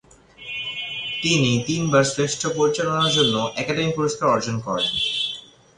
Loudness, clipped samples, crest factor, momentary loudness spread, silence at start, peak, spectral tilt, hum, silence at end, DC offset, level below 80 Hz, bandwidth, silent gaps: -21 LUFS; under 0.1%; 18 dB; 9 LU; 0.4 s; -4 dBFS; -4 dB/octave; none; 0.35 s; under 0.1%; -54 dBFS; 11 kHz; none